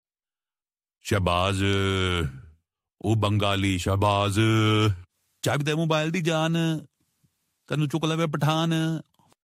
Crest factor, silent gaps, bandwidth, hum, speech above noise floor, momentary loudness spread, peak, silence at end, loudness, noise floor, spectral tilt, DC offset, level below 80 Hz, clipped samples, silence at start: 18 dB; none; 15 kHz; none; over 66 dB; 9 LU; -8 dBFS; 0.55 s; -25 LUFS; under -90 dBFS; -5.5 dB/octave; under 0.1%; -50 dBFS; under 0.1%; 1.05 s